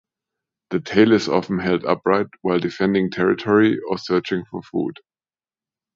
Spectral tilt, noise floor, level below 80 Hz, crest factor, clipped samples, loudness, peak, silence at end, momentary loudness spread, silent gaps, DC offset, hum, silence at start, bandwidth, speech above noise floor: -6.5 dB/octave; under -90 dBFS; -56 dBFS; 20 dB; under 0.1%; -20 LUFS; -2 dBFS; 1.05 s; 11 LU; none; under 0.1%; none; 0.7 s; 7.6 kHz; over 71 dB